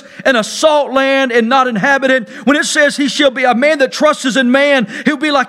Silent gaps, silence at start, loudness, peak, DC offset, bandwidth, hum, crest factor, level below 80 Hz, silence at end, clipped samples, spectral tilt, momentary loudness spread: none; 0.15 s; -12 LUFS; 0 dBFS; under 0.1%; 14 kHz; none; 12 dB; -58 dBFS; 0 s; under 0.1%; -3 dB/octave; 3 LU